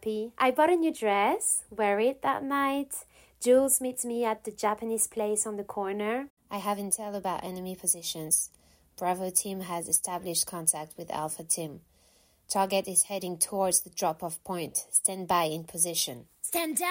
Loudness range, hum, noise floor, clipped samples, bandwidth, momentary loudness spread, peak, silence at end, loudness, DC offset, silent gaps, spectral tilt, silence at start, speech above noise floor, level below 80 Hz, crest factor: 4 LU; none; -64 dBFS; under 0.1%; 16.5 kHz; 10 LU; -10 dBFS; 0 s; -28 LUFS; under 0.1%; 6.30-6.37 s; -2.5 dB/octave; 0 s; 35 dB; -68 dBFS; 20 dB